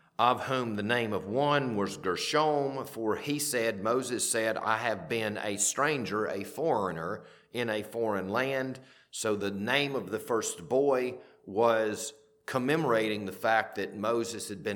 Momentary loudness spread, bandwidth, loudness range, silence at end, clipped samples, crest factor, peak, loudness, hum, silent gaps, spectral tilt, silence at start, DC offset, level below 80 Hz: 9 LU; 19 kHz; 3 LU; 0 s; under 0.1%; 20 dB; -10 dBFS; -30 LUFS; none; none; -3.5 dB/octave; 0.2 s; under 0.1%; -72 dBFS